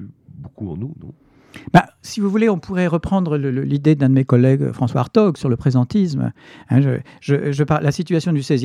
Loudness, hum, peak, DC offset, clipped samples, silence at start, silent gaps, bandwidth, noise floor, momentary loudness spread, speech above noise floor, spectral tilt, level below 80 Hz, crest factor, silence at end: -18 LUFS; none; 0 dBFS; under 0.1%; under 0.1%; 0 s; none; 11 kHz; -39 dBFS; 13 LU; 21 dB; -8 dB/octave; -48 dBFS; 18 dB; 0 s